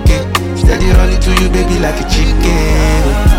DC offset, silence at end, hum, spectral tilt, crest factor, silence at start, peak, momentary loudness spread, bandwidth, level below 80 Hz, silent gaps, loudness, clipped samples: under 0.1%; 0 s; none; -5.5 dB/octave; 10 dB; 0 s; 0 dBFS; 3 LU; 16 kHz; -12 dBFS; none; -12 LUFS; under 0.1%